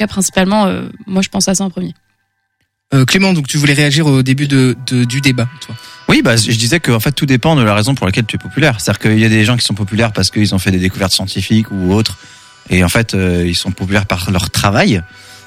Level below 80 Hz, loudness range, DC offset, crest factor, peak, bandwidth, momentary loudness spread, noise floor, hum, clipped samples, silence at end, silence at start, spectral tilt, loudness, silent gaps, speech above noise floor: -38 dBFS; 2 LU; under 0.1%; 12 dB; 0 dBFS; 16 kHz; 8 LU; -66 dBFS; none; under 0.1%; 0.1 s; 0 s; -4.5 dB/octave; -12 LUFS; none; 54 dB